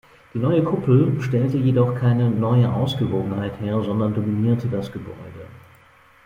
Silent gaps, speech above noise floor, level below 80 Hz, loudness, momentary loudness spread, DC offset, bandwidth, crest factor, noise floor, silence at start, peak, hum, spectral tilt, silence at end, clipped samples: none; 32 dB; -52 dBFS; -21 LUFS; 15 LU; under 0.1%; 6.8 kHz; 16 dB; -52 dBFS; 0.35 s; -4 dBFS; none; -9 dB/octave; 0.65 s; under 0.1%